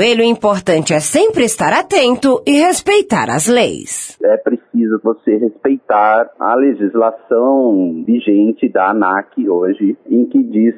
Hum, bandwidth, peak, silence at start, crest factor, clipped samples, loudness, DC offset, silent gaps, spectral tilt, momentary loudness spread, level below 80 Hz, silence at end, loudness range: none; 11 kHz; 0 dBFS; 0 s; 12 dB; under 0.1%; -13 LUFS; under 0.1%; none; -4 dB/octave; 5 LU; -54 dBFS; 0 s; 2 LU